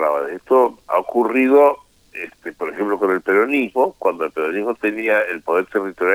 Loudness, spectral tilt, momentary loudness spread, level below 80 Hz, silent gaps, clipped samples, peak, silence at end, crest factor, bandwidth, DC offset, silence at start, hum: -18 LUFS; -6 dB/octave; 15 LU; -62 dBFS; none; under 0.1%; -2 dBFS; 0 s; 16 dB; 16 kHz; under 0.1%; 0 s; none